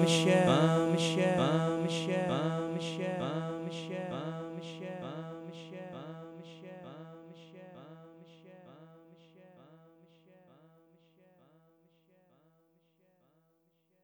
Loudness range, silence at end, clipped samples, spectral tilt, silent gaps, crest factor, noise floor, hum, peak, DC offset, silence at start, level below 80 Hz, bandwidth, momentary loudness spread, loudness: 25 LU; 4.3 s; under 0.1%; -5.5 dB/octave; none; 22 dB; -74 dBFS; none; -12 dBFS; under 0.1%; 0 s; -74 dBFS; 11.5 kHz; 26 LU; -32 LUFS